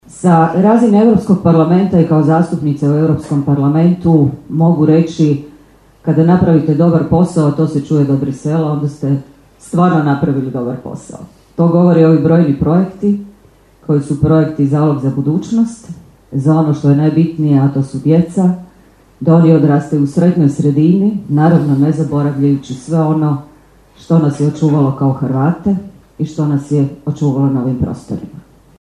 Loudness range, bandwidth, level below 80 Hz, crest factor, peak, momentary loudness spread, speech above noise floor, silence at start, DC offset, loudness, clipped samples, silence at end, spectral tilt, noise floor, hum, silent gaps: 4 LU; 10.5 kHz; -44 dBFS; 12 dB; 0 dBFS; 10 LU; 34 dB; 0.15 s; under 0.1%; -12 LUFS; under 0.1%; 0.4 s; -9 dB/octave; -45 dBFS; none; none